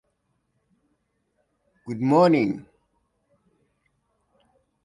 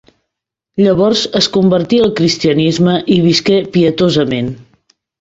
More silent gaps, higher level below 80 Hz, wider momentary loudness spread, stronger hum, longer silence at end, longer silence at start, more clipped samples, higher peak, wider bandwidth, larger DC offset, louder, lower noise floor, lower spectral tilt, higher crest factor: neither; second, -68 dBFS vs -46 dBFS; first, 18 LU vs 6 LU; neither; first, 2.25 s vs 0.65 s; first, 1.85 s vs 0.75 s; neither; second, -6 dBFS vs 0 dBFS; first, 10.5 kHz vs 8 kHz; neither; second, -21 LUFS vs -12 LUFS; second, -73 dBFS vs -78 dBFS; first, -8 dB/octave vs -5.5 dB/octave; first, 22 dB vs 12 dB